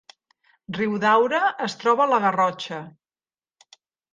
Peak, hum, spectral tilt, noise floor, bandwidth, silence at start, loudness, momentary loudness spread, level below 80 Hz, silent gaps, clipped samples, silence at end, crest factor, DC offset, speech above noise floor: -6 dBFS; none; -5 dB/octave; under -90 dBFS; 9.6 kHz; 0.7 s; -21 LUFS; 14 LU; -72 dBFS; none; under 0.1%; 1.25 s; 18 dB; under 0.1%; over 69 dB